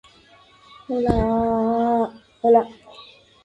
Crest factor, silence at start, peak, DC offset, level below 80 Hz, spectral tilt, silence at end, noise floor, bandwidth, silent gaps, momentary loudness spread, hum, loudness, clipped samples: 18 dB; 0.9 s; -4 dBFS; under 0.1%; -40 dBFS; -8.5 dB/octave; 0.4 s; -52 dBFS; 8.2 kHz; none; 11 LU; none; -21 LUFS; under 0.1%